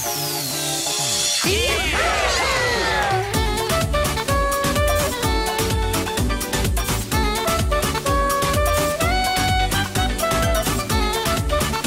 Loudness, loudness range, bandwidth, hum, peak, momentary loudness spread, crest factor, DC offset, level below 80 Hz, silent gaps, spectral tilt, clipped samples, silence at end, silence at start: -20 LUFS; 2 LU; 16.5 kHz; none; -6 dBFS; 3 LU; 14 dB; under 0.1%; -28 dBFS; none; -3.5 dB/octave; under 0.1%; 0 s; 0 s